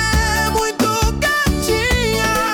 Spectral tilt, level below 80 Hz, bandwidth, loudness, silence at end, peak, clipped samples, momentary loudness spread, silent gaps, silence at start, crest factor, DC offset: -3.5 dB/octave; -24 dBFS; 18 kHz; -16 LUFS; 0 s; -4 dBFS; under 0.1%; 1 LU; none; 0 s; 12 dB; under 0.1%